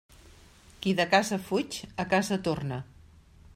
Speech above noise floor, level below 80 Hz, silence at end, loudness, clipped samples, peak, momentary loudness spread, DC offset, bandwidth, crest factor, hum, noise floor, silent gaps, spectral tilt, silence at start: 27 dB; -58 dBFS; 0.7 s; -28 LUFS; under 0.1%; -10 dBFS; 12 LU; under 0.1%; 16 kHz; 20 dB; none; -55 dBFS; none; -4.5 dB/octave; 0.8 s